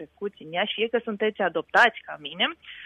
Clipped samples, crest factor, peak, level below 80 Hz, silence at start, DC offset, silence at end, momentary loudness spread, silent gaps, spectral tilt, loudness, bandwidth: under 0.1%; 20 dB; -6 dBFS; -70 dBFS; 0 s; under 0.1%; 0 s; 16 LU; none; -4 dB/octave; -24 LUFS; 12.5 kHz